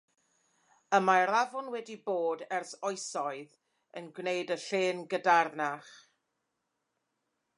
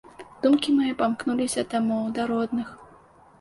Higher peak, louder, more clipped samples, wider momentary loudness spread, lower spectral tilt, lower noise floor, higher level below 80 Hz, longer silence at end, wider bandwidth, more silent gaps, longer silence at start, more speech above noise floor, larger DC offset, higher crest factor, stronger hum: about the same, -10 dBFS vs -10 dBFS; second, -31 LUFS vs -25 LUFS; neither; first, 15 LU vs 7 LU; about the same, -3.5 dB/octave vs -4.5 dB/octave; first, -83 dBFS vs -53 dBFS; second, -90 dBFS vs -60 dBFS; first, 1.6 s vs 0.55 s; about the same, 11 kHz vs 11.5 kHz; neither; first, 0.9 s vs 0.2 s; first, 52 dB vs 29 dB; neither; first, 22 dB vs 16 dB; neither